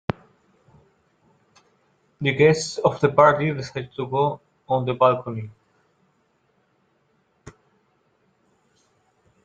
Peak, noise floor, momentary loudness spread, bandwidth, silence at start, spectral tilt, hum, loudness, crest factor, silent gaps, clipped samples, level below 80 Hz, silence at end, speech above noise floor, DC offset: 0 dBFS; -66 dBFS; 17 LU; 9.2 kHz; 2.2 s; -6 dB/octave; none; -21 LUFS; 24 dB; none; under 0.1%; -60 dBFS; 1.95 s; 46 dB; under 0.1%